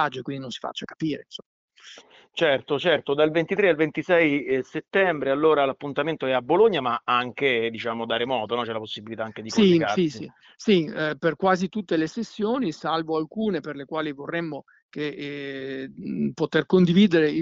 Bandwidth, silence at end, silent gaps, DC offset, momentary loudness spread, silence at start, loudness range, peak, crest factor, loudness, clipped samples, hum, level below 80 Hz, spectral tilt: 7.8 kHz; 0 s; 1.46-1.68 s, 14.82-14.89 s; under 0.1%; 13 LU; 0 s; 6 LU; -8 dBFS; 16 dB; -24 LUFS; under 0.1%; none; -64 dBFS; -6 dB/octave